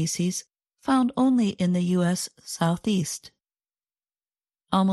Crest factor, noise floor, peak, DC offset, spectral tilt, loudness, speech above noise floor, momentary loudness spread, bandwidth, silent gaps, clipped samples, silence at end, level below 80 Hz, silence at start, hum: 18 dB; under -90 dBFS; -6 dBFS; under 0.1%; -5.5 dB/octave; -25 LUFS; over 66 dB; 11 LU; 12.5 kHz; none; under 0.1%; 0 s; -62 dBFS; 0 s; none